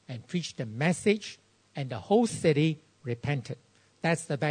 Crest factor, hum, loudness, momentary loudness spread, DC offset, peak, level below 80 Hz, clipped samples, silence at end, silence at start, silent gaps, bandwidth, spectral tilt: 18 dB; none; -29 LUFS; 14 LU; under 0.1%; -10 dBFS; -66 dBFS; under 0.1%; 0 s; 0.1 s; none; 9.6 kHz; -6 dB/octave